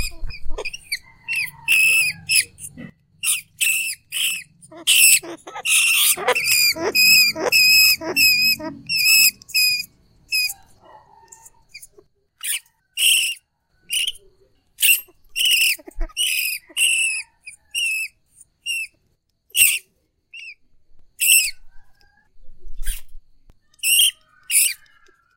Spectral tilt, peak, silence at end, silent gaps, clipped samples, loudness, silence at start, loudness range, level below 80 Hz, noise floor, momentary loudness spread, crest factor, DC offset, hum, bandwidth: 1.5 dB/octave; 0 dBFS; 0.6 s; none; under 0.1%; -16 LUFS; 0 s; 9 LU; -40 dBFS; -67 dBFS; 20 LU; 20 dB; under 0.1%; none; 17 kHz